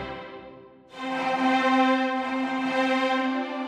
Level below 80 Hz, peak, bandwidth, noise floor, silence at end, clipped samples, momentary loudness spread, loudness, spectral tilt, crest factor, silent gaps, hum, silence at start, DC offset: -62 dBFS; -10 dBFS; 9.8 kHz; -47 dBFS; 0 s; under 0.1%; 15 LU; -24 LUFS; -4 dB/octave; 14 dB; none; none; 0 s; under 0.1%